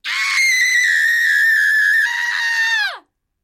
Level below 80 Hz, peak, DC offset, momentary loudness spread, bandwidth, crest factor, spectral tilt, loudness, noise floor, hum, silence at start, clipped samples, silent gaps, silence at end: -76 dBFS; -6 dBFS; under 0.1%; 5 LU; 16.5 kHz; 10 dB; 5 dB/octave; -14 LUFS; -41 dBFS; none; 0.05 s; under 0.1%; none; 0.45 s